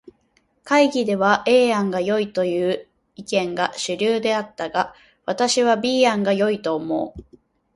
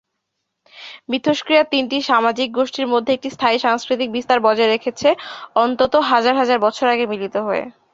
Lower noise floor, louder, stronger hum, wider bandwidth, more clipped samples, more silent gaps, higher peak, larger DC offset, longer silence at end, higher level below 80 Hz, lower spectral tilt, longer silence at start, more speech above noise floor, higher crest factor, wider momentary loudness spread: second, -64 dBFS vs -76 dBFS; about the same, -20 LUFS vs -18 LUFS; neither; first, 11.5 kHz vs 7.8 kHz; neither; neither; about the same, -2 dBFS vs 0 dBFS; neither; first, 0.55 s vs 0.25 s; about the same, -58 dBFS vs -60 dBFS; about the same, -4 dB/octave vs -4 dB/octave; about the same, 0.65 s vs 0.75 s; second, 44 dB vs 58 dB; about the same, 18 dB vs 18 dB; about the same, 9 LU vs 7 LU